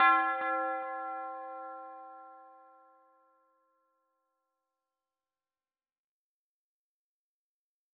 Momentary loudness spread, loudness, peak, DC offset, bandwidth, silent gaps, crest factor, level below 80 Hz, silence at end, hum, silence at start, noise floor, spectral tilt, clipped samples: 23 LU; -33 LUFS; -12 dBFS; under 0.1%; 4.8 kHz; none; 24 dB; under -90 dBFS; 5.4 s; none; 0 s; under -90 dBFS; 3 dB/octave; under 0.1%